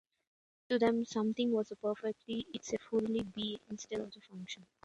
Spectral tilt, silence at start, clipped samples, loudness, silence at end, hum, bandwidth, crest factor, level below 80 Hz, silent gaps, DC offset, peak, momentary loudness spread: -5 dB/octave; 0.7 s; under 0.1%; -36 LUFS; 0.2 s; none; 9 kHz; 18 dB; -72 dBFS; none; under 0.1%; -18 dBFS; 14 LU